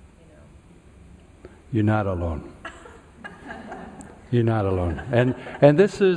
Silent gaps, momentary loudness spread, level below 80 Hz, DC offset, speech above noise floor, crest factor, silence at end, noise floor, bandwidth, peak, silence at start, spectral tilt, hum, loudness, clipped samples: none; 23 LU; -44 dBFS; under 0.1%; 29 dB; 22 dB; 0 s; -49 dBFS; 10.5 kHz; -2 dBFS; 1.45 s; -8 dB/octave; none; -22 LUFS; under 0.1%